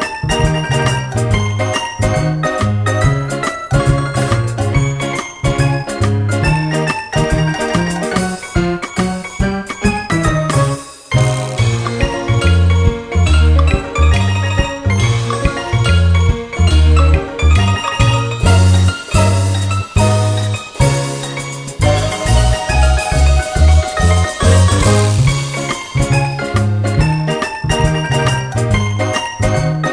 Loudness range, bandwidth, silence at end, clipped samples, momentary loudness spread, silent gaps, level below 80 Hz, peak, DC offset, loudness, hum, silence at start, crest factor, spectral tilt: 4 LU; 10.5 kHz; 0 s; under 0.1%; 6 LU; none; -20 dBFS; 0 dBFS; under 0.1%; -14 LUFS; none; 0 s; 14 dB; -5.5 dB/octave